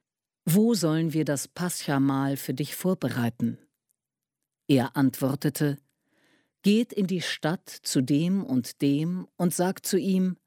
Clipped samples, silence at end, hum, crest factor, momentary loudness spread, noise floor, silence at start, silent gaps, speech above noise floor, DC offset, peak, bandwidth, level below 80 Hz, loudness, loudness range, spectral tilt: under 0.1%; 0.15 s; none; 16 dB; 7 LU; -88 dBFS; 0.45 s; none; 63 dB; under 0.1%; -10 dBFS; 17.5 kHz; -72 dBFS; -26 LUFS; 3 LU; -5.5 dB/octave